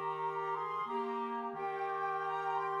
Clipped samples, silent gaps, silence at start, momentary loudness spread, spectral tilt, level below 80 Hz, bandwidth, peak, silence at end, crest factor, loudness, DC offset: under 0.1%; none; 0 s; 3 LU; -6 dB/octave; -84 dBFS; 11.5 kHz; -24 dBFS; 0 s; 12 dB; -37 LUFS; under 0.1%